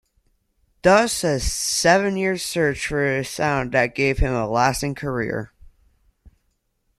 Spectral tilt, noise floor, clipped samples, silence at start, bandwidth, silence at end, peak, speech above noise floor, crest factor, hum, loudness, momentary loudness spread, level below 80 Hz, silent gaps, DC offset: -4 dB/octave; -70 dBFS; under 0.1%; 0.85 s; 14 kHz; 0.7 s; -2 dBFS; 49 dB; 20 dB; none; -21 LUFS; 9 LU; -36 dBFS; none; under 0.1%